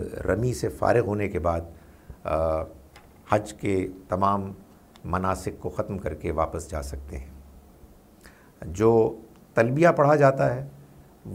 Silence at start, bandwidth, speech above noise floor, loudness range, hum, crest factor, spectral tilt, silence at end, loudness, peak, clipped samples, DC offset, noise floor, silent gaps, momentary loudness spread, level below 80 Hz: 0 s; 16 kHz; 27 dB; 8 LU; none; 22 dB; -7 dB/octave; 0 s; -25 LUFS; -4 dBFS; under 0.1%; under 0.1%; -52 dBFS; none; 20 LU; -44 dBFS